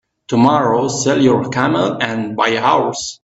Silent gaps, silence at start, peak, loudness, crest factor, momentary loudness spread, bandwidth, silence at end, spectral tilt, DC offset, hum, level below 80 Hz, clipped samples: none; 0.3 s; 0 dBFS; -15 LUFS; 14 dB; 7 LU; 8.2 kHz; 0.1 s; -5 dB/octave; under 0.1%; none; -54 dBFS; under 0.1%